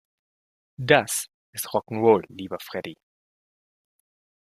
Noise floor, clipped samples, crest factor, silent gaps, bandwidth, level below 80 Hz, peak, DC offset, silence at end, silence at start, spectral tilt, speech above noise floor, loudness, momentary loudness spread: under -90 dBFS; under 0.1%; 26 dB; 1.34-1.53 s; 16 kHz; -68 dBFS; -2 dBFS; under 0.1%; 1.5 s; 0.8 s; -4 dB/octave; over 66 dB; -23 LUFS; 15 LU